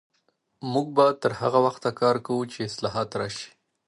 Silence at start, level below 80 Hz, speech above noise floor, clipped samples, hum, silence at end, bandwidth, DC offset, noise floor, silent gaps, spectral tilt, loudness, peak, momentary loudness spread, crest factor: 0.6 s; -64 dBFS; 47 dB; under 0.1%; none; 0.4 s; 11.5 kHz; under 0.1%; -71 dBFS; none; -5.5 dB/octave; -25 LUFS; -6 dBFS; 12 LU; 20 dB